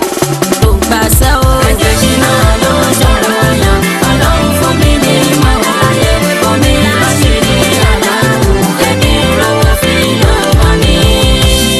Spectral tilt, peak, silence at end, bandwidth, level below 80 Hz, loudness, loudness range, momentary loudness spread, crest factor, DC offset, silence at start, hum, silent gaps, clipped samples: -4.5 dB/octave; 0 dBFS; 0 s; 13.5 kHz; -14 dBFS; -9 LUFS; 0 LU; 2 LU; 8 dB; under 0.1%; 0 s; none; none; 0.7%